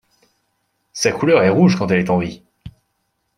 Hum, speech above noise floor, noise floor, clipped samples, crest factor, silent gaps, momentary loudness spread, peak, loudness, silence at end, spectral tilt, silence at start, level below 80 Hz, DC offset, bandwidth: none; 55 dB; -70 dBFS; under 0.1%; 16 dB; none; 17 LU; -2 dBFS; -16 LUFS; 0.65 s; -6 dB/octave; 0.95 s; -52 dBFS; under 0.1%; 12 kHz